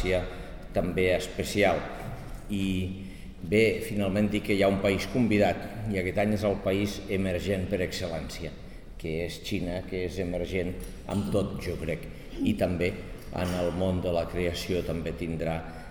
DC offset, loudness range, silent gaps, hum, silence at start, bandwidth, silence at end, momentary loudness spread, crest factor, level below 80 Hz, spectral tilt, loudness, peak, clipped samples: 0.3%; 6 LU; none; none; 0 s; 19 kHz; 0 s; 13 LU; 18 dB; -42 dBFS; -6 dB/octave; -29 LUFS; -10 dBFS; under 0.1%